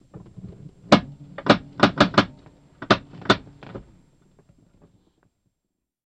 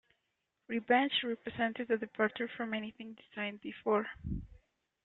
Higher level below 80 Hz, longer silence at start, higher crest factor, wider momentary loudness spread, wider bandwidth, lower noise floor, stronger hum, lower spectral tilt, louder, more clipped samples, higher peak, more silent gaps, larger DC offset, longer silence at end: first, -52 dBFS vs -58 dBFS; second, 0.45 s vs 0.7 s; about the same, 24 dB vs 20 dB; first, 24 LU vs 13 LU; first, 9.8 kHz vs 4.2 kHz; about the same, -81 dBFS vs -83 dBFS; neither; second, -5.5 dB/octave vs -8 dB/octave; first, -21 LUFS vs -35 LUFS; neither; first, -2 dBFS vs -16 dBFS; neither; neither; first, 2.25 s vs 0.5 s